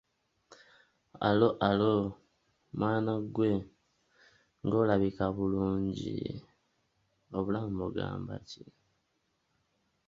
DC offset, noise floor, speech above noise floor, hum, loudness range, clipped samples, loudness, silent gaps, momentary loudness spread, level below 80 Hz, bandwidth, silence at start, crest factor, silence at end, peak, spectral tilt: under 0.1%; -78 dBFS; 47 dB; none; 9 LU; under 0.1%; -31 LUFS; none; 14 LU; -58 dBFS; 7.4 kHz; 0.5 s; 22 dB; 1.5 s; -12 dBFS; -8 dB/octave